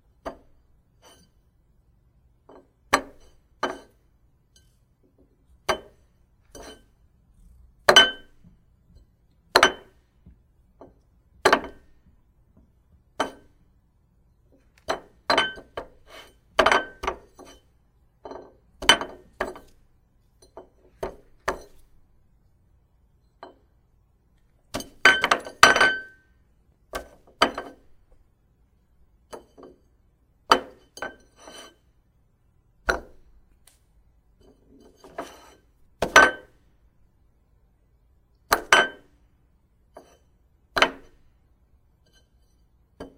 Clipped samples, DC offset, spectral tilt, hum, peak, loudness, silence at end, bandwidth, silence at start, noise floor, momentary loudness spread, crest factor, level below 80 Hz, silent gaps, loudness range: under 0.1%; under 0.1%; -1 dB/octave; none; 0 dBFS; -22 LUFS; 0.1 s; 16 kHz; 0.25 s; -63 dBFS; 28 LU; 28 dB; -52 dBFS; none; 16 LU